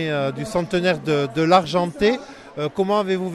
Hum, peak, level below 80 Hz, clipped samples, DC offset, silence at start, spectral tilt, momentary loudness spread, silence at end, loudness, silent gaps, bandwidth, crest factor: none; -2 dBFS; -52 dBFS; under 0.1%; under 0.1%; 0 s; -6 dB/octave; 10 LU; 0 s; -21 LUFS; none; 13.5 kHz; 18 dB